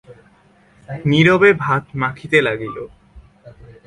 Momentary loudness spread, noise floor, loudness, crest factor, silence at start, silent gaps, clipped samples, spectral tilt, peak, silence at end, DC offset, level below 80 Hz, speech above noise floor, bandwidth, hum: 21 LU; -52 dBFS; -16 LUFS; 18 dB; 0.1 s; none; under 0.1%; -6.5 dB/octave; 0 dBFS; 0.15 s; under 0.1%; -50 dBFS; 36 dB; 11 kHz; none